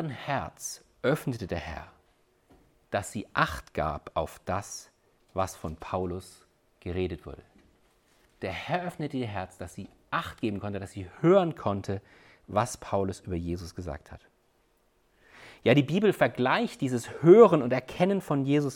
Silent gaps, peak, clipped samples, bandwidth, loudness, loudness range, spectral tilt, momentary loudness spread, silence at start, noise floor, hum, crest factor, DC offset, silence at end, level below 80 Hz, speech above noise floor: none; -6 dBFS; under 0.1%; 17 kHz; -28 LUFS; 13 LU; -6 dB/octave; 17 LU; 0 s; -68 dBFS; none; 22 dB; under 0.1%; 0 s; -54 dBFS; 41 dB